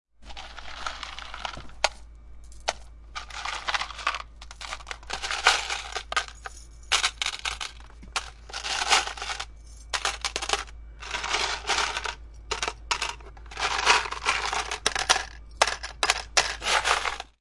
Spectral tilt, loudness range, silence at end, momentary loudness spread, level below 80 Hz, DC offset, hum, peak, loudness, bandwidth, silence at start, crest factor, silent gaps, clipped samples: 0 dB/octave; 8 LU; 0.15 s; 18 LU; -46 dBFS; under 0.1%; none; -2 dBFS; -27 LUFS; 11.5 kHz; 0.2 s; 28 dB; none; under 0.1%